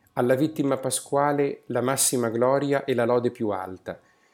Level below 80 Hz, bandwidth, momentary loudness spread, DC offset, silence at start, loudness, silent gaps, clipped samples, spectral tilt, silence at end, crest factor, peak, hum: -72 dBFS; 18.5 kHz; 11 LU; under 0.1%; 0.15 s; -24 LUFS; none; under 0.1%; -4.5 dB/octave; 0.4 s; 16 dB; -8 dBFS; none